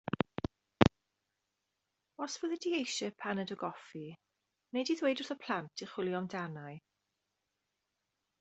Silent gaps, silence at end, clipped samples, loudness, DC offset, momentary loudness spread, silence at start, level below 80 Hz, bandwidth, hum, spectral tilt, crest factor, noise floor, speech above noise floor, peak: none; 1.6 s; under 0.1%; -36 LUFS; under 0.1%; 17 LU; 0.8 s; -62 dBFS; 8.2 kHz; none; -5 dB/octave; 34 dB; -86 dBFS; 48 dB; -4 dBFS